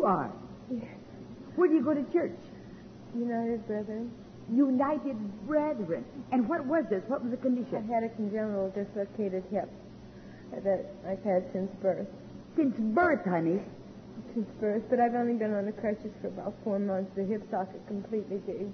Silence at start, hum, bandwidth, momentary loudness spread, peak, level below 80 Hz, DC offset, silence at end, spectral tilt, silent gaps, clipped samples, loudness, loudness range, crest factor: 0 s; none; 6.4 kHz; 19 LU; -14 dBFS; -64 dBFS; under 0.1%; 0 s; -9 dB/octave; none; under 0.1%; -31 LUFS; 4 LU; 18 dB